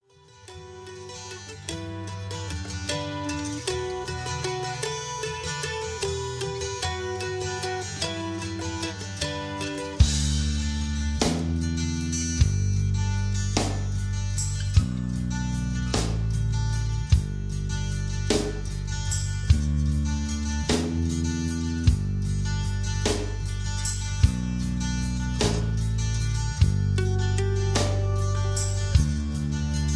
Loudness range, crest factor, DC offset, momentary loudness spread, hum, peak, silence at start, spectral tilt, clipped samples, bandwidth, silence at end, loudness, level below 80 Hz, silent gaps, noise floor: 5 LU; 20 dB; under 0.1%; 7 LU; none; -6 dBFS; 0.35 s; -5 dB/octave; under 0.1%; 11 kHz; 0 s; -27 LUFS; -32 dBFS; none; -51 dBFS